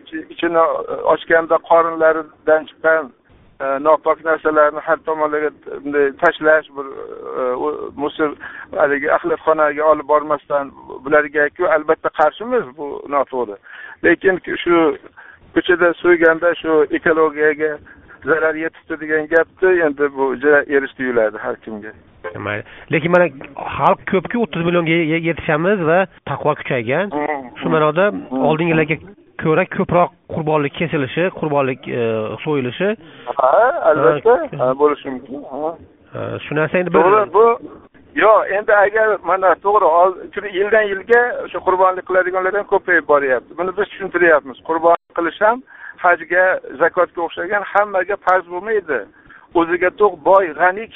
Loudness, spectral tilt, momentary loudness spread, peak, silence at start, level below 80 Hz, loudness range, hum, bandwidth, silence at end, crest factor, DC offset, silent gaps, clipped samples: -16 LUFS; -4 dB/octave; 12 LU; 0 dBFS; 0.05 s; -52 dBFS; 4 LU; none; 4 kHz; 0.1 s; 16 dB; under 0.1%; none; under 0.1%